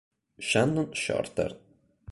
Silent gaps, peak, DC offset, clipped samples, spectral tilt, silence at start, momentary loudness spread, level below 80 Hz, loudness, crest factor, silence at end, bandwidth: none; -10 dBFS; under 0.1%; under 0.1%; -4.5 dB/octave; 0.4 s; 9 LU; -56 dBFS; -28 LUFS; 20 dB; 0.55 s; 11.5 kHz